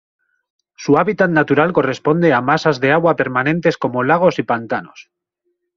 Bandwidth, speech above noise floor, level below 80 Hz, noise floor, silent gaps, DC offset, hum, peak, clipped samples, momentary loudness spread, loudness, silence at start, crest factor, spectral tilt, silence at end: 7.4 kHz; 56 dB; -56 dBFS; -71 dBFS; none; under 0.1%; none; -2 dBFS; under 0.1%; 6 LU; -15 LUFS; 0.8 s; 16 dB; -7 dB/octave; 0.75 s